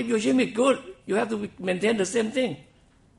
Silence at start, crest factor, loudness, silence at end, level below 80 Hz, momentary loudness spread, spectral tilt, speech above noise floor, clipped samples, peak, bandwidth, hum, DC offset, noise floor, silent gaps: 0 s; 18 dB; -25 LUFS; 0.55 s; -62 dBFS; 8 LU; -4.5 dB/octave; 34 dB; under 0.1%; -8 dBFS; 11.5 kHz; none; under 0.1%; -58 dBFS; none